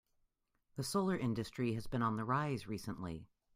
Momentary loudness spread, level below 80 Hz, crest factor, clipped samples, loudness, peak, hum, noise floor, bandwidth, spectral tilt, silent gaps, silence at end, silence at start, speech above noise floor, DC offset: 10 LU; -64 dBFS; 18 dB; under 0.1%; -39 LUFS; -22 dBFS; none; -81 dBFS; 16 kHz; -6 dB/octave; none; 0.3 s; 0.75 s; 43 dB; under 0.1%